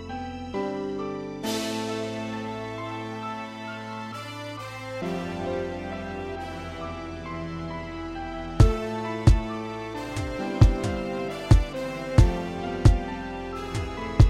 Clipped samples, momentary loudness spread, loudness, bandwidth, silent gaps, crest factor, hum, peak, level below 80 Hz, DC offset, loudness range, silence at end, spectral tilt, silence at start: under 0.1%; 13 LU; -28 LUFS; 14.5 kHz; none; 20 dB; none; -6 dBFS; -30 dBFS; under 0.1%; 9 LU; 0 s; -6.5 dB/octave; 0 s